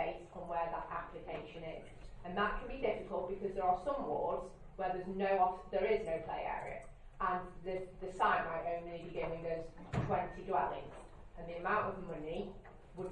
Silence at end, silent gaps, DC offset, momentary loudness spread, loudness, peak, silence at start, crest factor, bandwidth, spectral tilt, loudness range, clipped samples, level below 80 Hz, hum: 0 s; none; under 0.1%; 14 LU; -39 LUFS; -20 dBFS; 0 s; 20 dB; 10 kHz; -7 dB/octave; 4 LU; under 0.1%; -56 dBFS; none